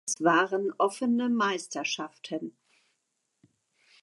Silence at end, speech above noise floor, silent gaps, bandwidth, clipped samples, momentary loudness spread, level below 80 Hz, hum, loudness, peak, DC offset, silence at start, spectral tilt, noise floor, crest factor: 1.5 s; 51 dB; none; 11.5 kHz; under 0.1%; 13 LU; -86 dBFS; none; -28 LUFS; -10 dBFS; under 0.1%; 0.05 s; -3.5 dB/octave; -79 dBFS; 20 dB